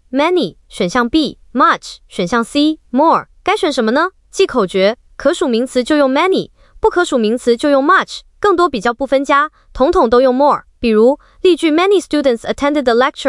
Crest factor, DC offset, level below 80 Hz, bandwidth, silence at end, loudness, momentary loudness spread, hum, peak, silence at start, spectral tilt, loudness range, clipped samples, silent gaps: 12 dB; under 0.1%; -42 dBFS; 12 kHz; 0 s; -14 LUFS; 6 LU; none; -2 dBFS; 0.1 s; -4.5 dB/octave; 2 LU; under 0.1%; none